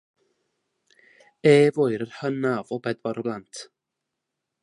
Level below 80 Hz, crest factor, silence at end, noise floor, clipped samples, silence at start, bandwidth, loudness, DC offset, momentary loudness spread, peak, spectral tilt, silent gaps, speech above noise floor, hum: -72 dBFS; 20 dB; 1 s; -83 dBFS; under 0.1%; 1.45 s; 11.5 kHz; -23 LUFS; under 0.1%; 17 LU; -4 dBFS; -6.5 dB/octave; none; 61 dB; none